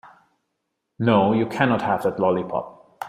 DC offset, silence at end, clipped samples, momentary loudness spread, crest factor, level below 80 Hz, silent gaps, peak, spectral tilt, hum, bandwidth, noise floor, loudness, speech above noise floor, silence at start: under 0.1%; 0 s; under 0.1%; 11 LU; 20 dB; -60 dBFS; none; -2 dBFS; -7.5 dB/octave; none; 15 kHz; -77 dBFS; -21 LUFS; 57 dB; 0.05 s